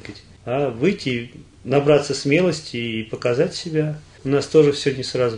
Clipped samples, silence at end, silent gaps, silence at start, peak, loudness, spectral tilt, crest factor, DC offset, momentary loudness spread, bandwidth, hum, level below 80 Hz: under 0.1%; 0 s; none; 0.05 s; -2 dBFS; -20 LUFS; -5.5 dB/octave; 18 dB; under 0.1%; 12 LU; 10.5 kHz; none; -54 dBFS